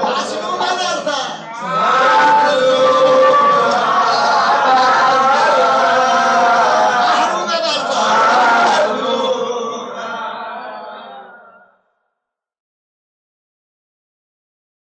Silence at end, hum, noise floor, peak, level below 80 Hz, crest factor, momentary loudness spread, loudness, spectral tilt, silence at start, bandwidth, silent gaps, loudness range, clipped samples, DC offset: 3.45 s; none; -78 dBFS; -2 dBFS; -68 dBFS; 14 dB; 14 LU; -13 LUFS; -2.5 dB/octave; 0 s; 9.4 kHz; none; 14 LU; under 0.1%; under 0.1%